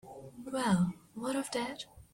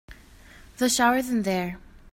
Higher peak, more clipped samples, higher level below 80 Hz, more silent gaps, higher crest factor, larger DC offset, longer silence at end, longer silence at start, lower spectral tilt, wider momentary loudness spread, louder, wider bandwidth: second, -18 dBFS vs -6 dBFS; neither; second, -64 dBFS vs -52 dBFS; neither; about the same, 18 dB vs 20 dB; neither; about the same, 0.1 s vs 0.05 s; about the same, 0.05 s vs 0.1 s; first, -5.5 dB/octave vs -3.5 dB/octave; first, 16 LU vs 13 LU; second, -34 LUFS vs -24 LUFS; about the same, 16.5 kHz vs 16.5 kHz